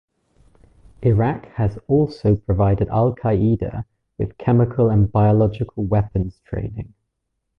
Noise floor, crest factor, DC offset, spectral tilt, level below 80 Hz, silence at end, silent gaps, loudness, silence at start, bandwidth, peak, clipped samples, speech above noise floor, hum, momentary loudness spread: -75 dBFS; 14 dB; under 0.1%; -11.5 dB/octave; -36 dBFS; 0.75 s; none; -20 LUFS; 1 s; 5.2 kHz; -6 dBFS; under 0.1%; 57 dB; none; 12 LU